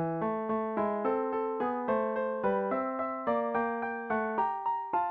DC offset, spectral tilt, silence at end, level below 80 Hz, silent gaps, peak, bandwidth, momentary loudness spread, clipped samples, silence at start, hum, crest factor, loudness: under 0.1%; -9.5 dB/octave; 0 s; -68 dBFS; none; -18 dBFS; 4.7 kHz; 3 LU; under 0.1%; 0 s; none; 14 dB; -31 LUFS